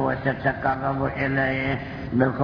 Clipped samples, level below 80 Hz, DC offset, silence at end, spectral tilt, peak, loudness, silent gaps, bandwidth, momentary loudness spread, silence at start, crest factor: under 0.1%; -44 dBFS; under 0.1%; 0 s; -9 dB/octave; -6 dBFS; -24 LUFS; none; 5.4 kHz; 4 LU; 0 s; 18 dB